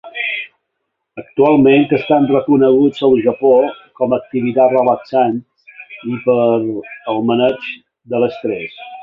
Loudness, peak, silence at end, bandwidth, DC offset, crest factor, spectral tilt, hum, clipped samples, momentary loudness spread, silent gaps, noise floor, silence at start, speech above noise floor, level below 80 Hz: -14 LUFS; -2 dBFS; 0 s; 5.6 kHz; under 0.1%; 14 dB; -8.5 dB/octave; none; under 0.1%; 15 LU; none; -73 dBFS; 0.05 s; 60 dB; -58 dBFS